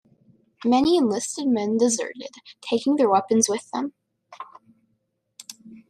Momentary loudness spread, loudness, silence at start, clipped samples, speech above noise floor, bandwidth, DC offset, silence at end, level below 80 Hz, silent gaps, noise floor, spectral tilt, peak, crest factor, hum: 23 LU; -22 LUFS; 0.6 s; under 0.1%; 51 dB; 13 kHz; under 0.1%; 0.1 s; -64 dBFS; none; -73 dBFS; -3.5 dB/octave; -6 dBFS; 18 dB; none